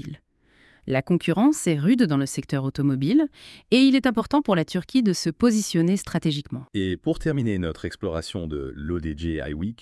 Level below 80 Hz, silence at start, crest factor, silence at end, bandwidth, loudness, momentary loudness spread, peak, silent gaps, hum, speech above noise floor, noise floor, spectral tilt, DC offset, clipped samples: -46 dBFS; 0.05 s; 18 dB; 0.05 s; 12 kHz; -23 LUFS; 11 LU; -6 dBFS; none; none; 36 dB; -59 dBFS; -6 dB/octave; under 0.1%; under 0.1%